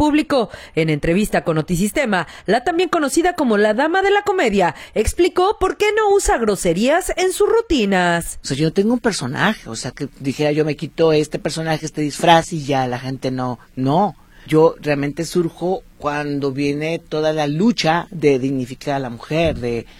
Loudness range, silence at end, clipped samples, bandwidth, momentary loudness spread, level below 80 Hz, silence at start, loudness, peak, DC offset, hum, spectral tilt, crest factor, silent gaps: 3 LU; 0.15 s; under 0.1%; 17.5 kHz; 8 LU; -38 dBFS; 0 s; -18 LUFS; 0 dBFS; under 0.1%; none; -5 dB/octave; 18 dB; none